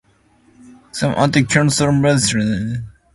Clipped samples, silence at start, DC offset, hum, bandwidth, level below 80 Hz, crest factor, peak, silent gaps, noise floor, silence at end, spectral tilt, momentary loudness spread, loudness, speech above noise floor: under 0.1%; 0.65 s; under 0.1%; none; 11.5 kHz; -44 dBFS; 16 dB; 0 dBFS; none; -54 dBFS; 0.25 s; -5 dB/octave; 11 LU; -16 LUFS; 39 dB